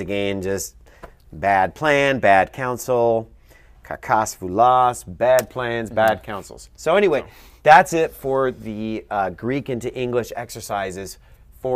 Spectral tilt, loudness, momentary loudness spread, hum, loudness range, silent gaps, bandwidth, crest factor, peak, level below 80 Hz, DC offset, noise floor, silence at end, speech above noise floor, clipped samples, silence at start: -4.5 dB/octave; -20 LUFS; 15 LU; none; 6 LU; none; 15.5 kHz; 20 dB; 0 dBFS; -48 dBFS; under 0.1%; -49 dBFS; 0 s; 29 dB; under 0.1%; 0 s